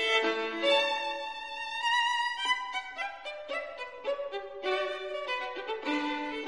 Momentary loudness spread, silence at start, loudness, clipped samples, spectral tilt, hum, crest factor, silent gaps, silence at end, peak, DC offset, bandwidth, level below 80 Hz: 11 LU; 0 s; -31 LUFS; under 0.1%; -1 dB/octave; none; 18 dB; none; 0 s; -14 dBFS; 0.1%; 11.5 kHz; -70 dBFS